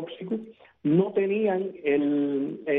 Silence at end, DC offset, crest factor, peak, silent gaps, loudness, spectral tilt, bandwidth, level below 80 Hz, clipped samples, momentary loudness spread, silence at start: 0 s; under 0.1%; 16 dB; -10 dBFS; none; -26 LUFS; -10.5 dB/octave; 3.9 kHz; -74 dBFS; under 0.1%; 10 LU; 0 s